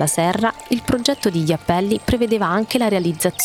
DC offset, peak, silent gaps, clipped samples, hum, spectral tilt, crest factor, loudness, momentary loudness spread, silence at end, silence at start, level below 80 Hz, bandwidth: under 0.1%; -2 dBFS; none; under 0.1%; none; -4.5 dB/octave; 16 dB; -19 LUFS; 3 LU; 0 s; 0 s; -42 dBFS; 17 kHz